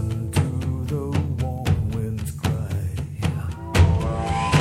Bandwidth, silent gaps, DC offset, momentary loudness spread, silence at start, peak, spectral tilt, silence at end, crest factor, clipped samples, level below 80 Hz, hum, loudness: 15 kHz; none; under 0.1%; 8 LU; 0 s; -4 dBFS; -6.5 dB/octave; 0 s; 18 dB; under 0.1%; -32 dBFS; none; -24 LUFS